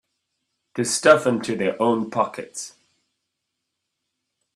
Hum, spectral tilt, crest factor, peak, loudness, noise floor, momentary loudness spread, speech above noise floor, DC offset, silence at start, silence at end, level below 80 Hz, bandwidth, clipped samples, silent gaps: none; -4 dB/octave; 24 dB; 0 dBFS; -20 LUFS; -80 dBFS; 18 LU; 59 dB; under 0.1%; 0.75 s; 1.85 s; -68 dBFS; 13 kHz; under 0.1%; none